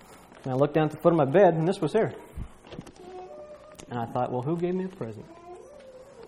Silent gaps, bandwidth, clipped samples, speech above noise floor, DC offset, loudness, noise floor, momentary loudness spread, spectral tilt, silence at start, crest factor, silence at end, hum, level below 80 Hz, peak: none; 15.5 kHz; under 0.1%; 23 dB; under 0.1%; -25 LUFS; -48 dBFS; 25 LU; -8 dB/octave; 0.1 s; 20 dB; 0 s; none; -54 dBFS; -6 dBFS